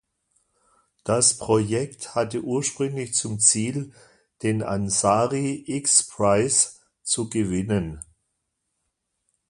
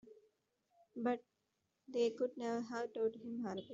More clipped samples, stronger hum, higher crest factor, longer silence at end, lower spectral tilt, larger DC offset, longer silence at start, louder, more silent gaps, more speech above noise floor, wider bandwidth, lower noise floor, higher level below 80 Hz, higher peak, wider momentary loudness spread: neither; neither; first, 24 dB vs 18 dB; first, 1.45 s vs 0 s; about the same, -3.5 dB/octave vs -4.5 dB/octave; neither; first, 1.05 s vs 0.05 s; first, -22 LUFS vs -41 LUFS; neither; first, 54 dB vs 45 dB; first, 11.5 kHz vs 7.8 kHz; second, -77 dBFS vs -85 dBFS; first, -52 dBFS vs -88 dBFS; first, -2 dBFS vs -24 dBFS; first, 11 LU vs 7 LU